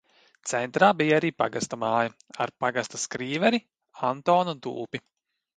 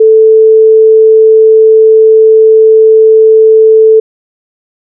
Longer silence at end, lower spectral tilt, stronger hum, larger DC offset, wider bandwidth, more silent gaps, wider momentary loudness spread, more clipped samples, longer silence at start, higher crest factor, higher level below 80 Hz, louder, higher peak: second, 0.6 s vs 1 s; second, -4 dB/octave vs -14 dB/octave; neither; neither; first, 11 kHz vs 0.6 kHz; neither; first, 12 LU vs 0 LU; second, under 0.1% vs 0.4%; first, 0.45 s vs 0 s; first, 22 dB vs 4 dB; first, -70 dBFS vs -88 dBFS; second, -26 LUFS vs -4 LUFS; second, -4 dBFS vs 0 dBFS